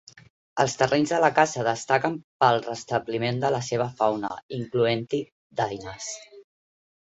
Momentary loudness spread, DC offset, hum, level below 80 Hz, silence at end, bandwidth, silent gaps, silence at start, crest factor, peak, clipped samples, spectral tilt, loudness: 13 LU; under 0.1%; none; -62 dBFS; 0.65 s; 8.4 kHz; 2.24-2.40 s, 4.43-4.49 s, 5.32-5.50 s; 0.55 s; 22 dB; -4 dBFS; under 0.1%; -4.5 dB/octave; -25 LUFS